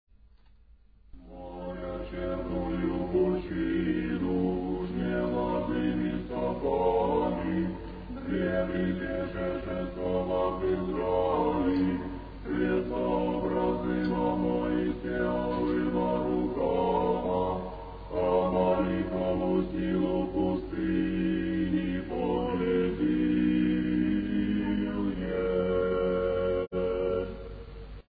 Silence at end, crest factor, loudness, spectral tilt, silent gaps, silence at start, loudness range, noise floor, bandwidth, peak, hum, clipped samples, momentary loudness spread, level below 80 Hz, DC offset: 0.1 s; 14 dB; -29 LUFS; -11 dB/octave; none; 1.15 s; 3 LU; -58 dBFS; 5 kHz; -14 dBFS; none; under 0.1%; 8 LU; -44 dBFS; under 0.1%